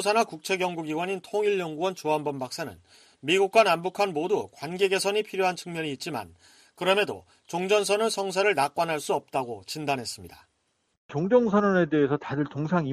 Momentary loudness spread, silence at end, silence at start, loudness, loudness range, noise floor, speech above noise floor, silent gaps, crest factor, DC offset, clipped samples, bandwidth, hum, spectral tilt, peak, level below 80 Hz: 12 LU; 0 s; 0 s; -26 LUFS; 3 LU; -73 dBFS; 47 dB; 10.97-11.09 s; 20 dB; under 0.1%; under 0.1%; 15 kHz; none; -4.5 dB/octave; -8 dBFS; -68 dBFS